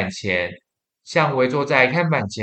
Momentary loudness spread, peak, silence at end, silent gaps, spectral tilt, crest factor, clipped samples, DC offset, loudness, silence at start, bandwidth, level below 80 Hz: 7 LU; 0 dBFS; 0 s; none; -5.5 dB/octave; 20 dB; under 0.1%; under 0.1%; -19 LUFS; 0 s; 8.8 kHz; -62 dBFS